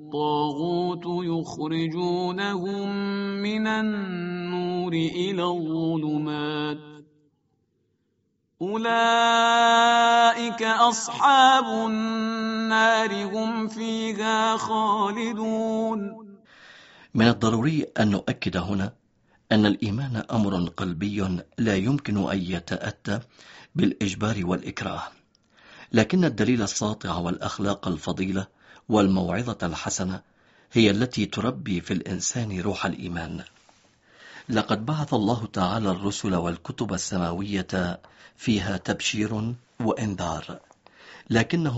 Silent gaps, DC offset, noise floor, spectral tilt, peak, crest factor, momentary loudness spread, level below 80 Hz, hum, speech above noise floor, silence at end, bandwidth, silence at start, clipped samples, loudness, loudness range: none; under 0.1%; -72 dBFS; -4 dB/octave; -4 dBFS; 22 dB; 12 LU; -54 dBFS; none; 48 dB; 0 s; 8 kHz; 0 s; under 0.1%; -25 LUFS; 8 LU